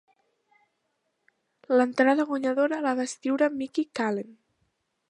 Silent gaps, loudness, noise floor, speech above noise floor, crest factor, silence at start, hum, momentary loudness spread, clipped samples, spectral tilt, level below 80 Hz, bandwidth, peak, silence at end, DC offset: none; -26 LUFS; -77 dBFS; 52 dB; 20 dB; 1.7 s; none; 8 LU; under 0.1%; -4.5 dB/octave; -80 dBFS; 11 kHz; -8 dBFS; 0.75 s; under 0.1%